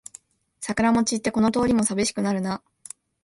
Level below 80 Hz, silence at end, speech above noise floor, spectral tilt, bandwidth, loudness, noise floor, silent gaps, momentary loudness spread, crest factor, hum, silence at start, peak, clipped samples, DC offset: -52 dBFS; 0.65 s; 29 dB; -4.5 dB/octave; 11.5 kHz; -23 LUFS; -51 dBFS; none; 21 LU; 16 dB; none; 0.6 s; -8 dBFS; under 0.1%; under 0.1%